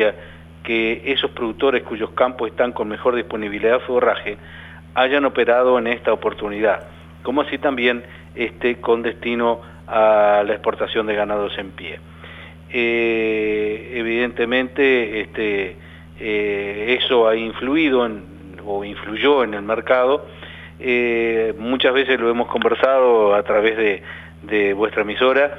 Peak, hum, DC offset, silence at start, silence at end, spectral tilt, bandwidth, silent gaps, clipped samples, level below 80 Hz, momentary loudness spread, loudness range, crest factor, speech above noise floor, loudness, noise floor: -2 dBFS; none; under 0.1%; 0 s; 0 s; -6.5 dB/octave; 5.8 kHz; none; under 0.1%; -48 dBFS; 14 LU; 4 LU; 18 dB; 19 dB; -19 LUFS; -38 dBFS